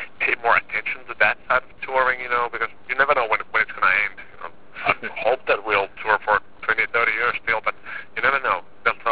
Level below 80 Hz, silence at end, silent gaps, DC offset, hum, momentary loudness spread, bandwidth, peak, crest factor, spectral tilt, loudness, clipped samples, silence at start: -56 dBFS; 0 s; none; 1%; none; 8 LU; 4 kHz; -2 dBFS; 20 dB; -6 dB/octave; -21 LUFS; under 0.1%; 0 s